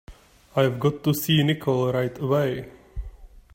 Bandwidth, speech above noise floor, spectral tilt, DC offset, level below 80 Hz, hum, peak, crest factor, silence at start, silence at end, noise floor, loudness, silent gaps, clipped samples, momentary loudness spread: 16.5 kHz; 21 dB; -6 dB/octave; under 0.1%; -44 dBFS; none; -8 dBFS; 18 dB; 0.1 s; 0.3 s; -43 dBFS; -23 LUFS; none; under 0.1%; 19 LU